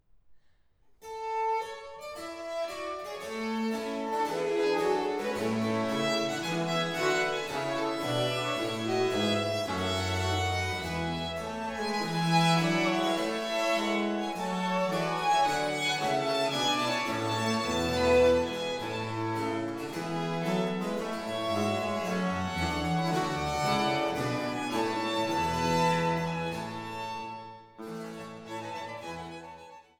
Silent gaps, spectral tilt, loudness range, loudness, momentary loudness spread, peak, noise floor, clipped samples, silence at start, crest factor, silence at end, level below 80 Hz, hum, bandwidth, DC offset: none; -4.5 dB/octave; 6 LU; -30 LUFS; 12 LU; -14 dBFS; -63 dBFS; under 0.1%; 0.3 s; 16 dB; 0.2 s; -56 dBFS; none; 20 kHz; under 0.1%